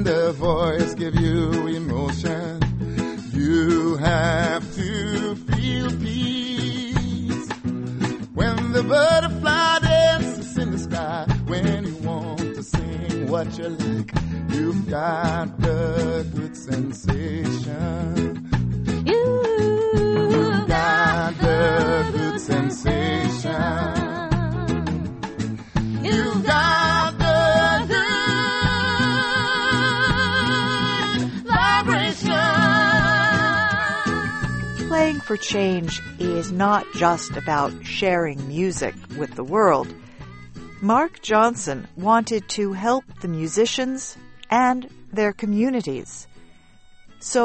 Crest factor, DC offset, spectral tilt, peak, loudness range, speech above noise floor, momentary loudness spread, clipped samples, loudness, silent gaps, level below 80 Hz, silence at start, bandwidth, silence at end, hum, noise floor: 18 dB; under 0.1%; -5 dB/octave; -4 dBFS; 6 LU; 27 dB; 10 LU; under 0.1%; -21 LUFS; none; -38 dBFS; 0 s; 8.8 kHz; 0 s; none; -48 dBFS